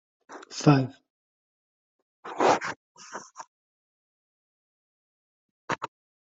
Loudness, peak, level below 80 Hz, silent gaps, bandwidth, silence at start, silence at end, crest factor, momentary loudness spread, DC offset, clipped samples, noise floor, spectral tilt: -26 LUFS; -4 dBFS; -68 dBFS; 1.10-2.23 s, 2.76-2.95 s, 3.47-5.68 s; 7.8 kHz; 0.3 s; 0.4 s; 26 dB; 25 LU; under 0.1%; under 0.1%; under -90 dBFS; -6 dB/octave